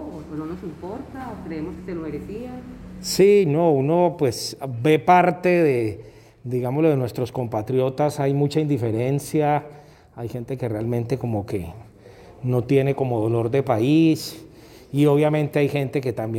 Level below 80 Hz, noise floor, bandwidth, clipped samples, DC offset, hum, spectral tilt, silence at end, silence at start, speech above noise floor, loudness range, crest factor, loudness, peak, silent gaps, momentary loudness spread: -52 dBFS; -46 dBFS; 17 kHz; under 0.1%; under 0.1%; none; -7 dB/octave; 0 s; 0 s; 24 dB; 7 LU; 18 dB; -21 LUFS; -4 dBFS; none; 16 LU